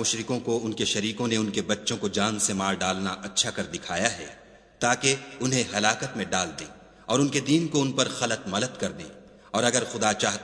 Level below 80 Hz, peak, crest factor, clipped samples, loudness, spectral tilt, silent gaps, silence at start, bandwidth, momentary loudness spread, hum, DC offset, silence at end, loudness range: -60 dBFS; -2 dBFS; 24 dB; under 0.1%; -26 LUFS; -3 dB/octave; none; 0 s; 11 kHz; 9 LU; none; under 0.1%; 0 s; 1 LU